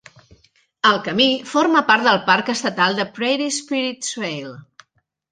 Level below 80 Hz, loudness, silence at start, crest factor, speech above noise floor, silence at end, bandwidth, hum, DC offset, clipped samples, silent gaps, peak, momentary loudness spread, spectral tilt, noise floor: -66 dBFS; -18 LUFS; 0.85 s; 18 dB; 46 dB; 0.7 s; 10 kHz; none; under 0.1%; under 0.1%; none; -2 dBFS; 10 LU; -3 dB/octave; -65 dBFS